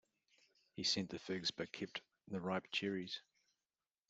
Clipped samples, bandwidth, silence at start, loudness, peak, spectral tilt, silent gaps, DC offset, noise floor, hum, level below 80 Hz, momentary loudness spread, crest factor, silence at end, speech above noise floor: under 0.1%; 8 kHz; 0.75 s; -42 LUFS; -26 dBFS; -3.5 dB/octave; none; under 0.1%; under -90 dBFS; none; -82 dBFS; 11 LU; 20 dB; 0.9 s; over 47 dB